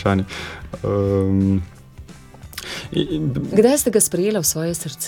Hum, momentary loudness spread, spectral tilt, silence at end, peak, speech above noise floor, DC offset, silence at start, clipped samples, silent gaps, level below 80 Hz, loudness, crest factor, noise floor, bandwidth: none; 15 LU; -5 dB/octave; 0 s; -2 dBFS; 21 dB; under 0.1%; 0 s; under 0.1%; none; -44 dBFS; -19 LUFS; 18 dB; -40 dBFS; 17.5 kHz